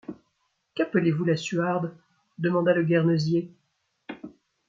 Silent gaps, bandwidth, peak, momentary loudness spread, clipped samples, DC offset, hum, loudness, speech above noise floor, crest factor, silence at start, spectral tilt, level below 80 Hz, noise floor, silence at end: none; 7.6 kHz; -10 dBFS; 21 LU; under 0.1%; under 0.1%; none; -25 LUFS; 50 dB; 16 dB; 0.1 s; -7 dB/octave; -70 dBFS; -74 dBFS; 0.4 s